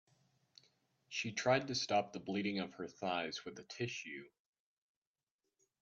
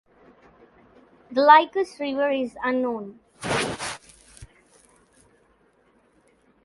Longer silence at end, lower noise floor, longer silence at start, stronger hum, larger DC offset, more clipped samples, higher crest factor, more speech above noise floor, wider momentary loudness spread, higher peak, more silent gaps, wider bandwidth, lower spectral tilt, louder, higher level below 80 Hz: second, 1.55 s vs 2.2 s; first, under -90 dBFS vs -62 dBFS; second, 1.1 s vs 1.3 s; neither; neither; neither; about the same, 24 dB vs 24 dB; first, over 51 dB vs 41 dB; second, 12 LU vs 19 LU; second, -18 dBFS vs -2 dBFS; neither; second, 8 kHz vs 11.5 kHz; about the same, -4 dB/octave vs -4 dB/octave; second, -39 LUFS vs -22 LUFS; second, -82 dBFS vs -60 dBFS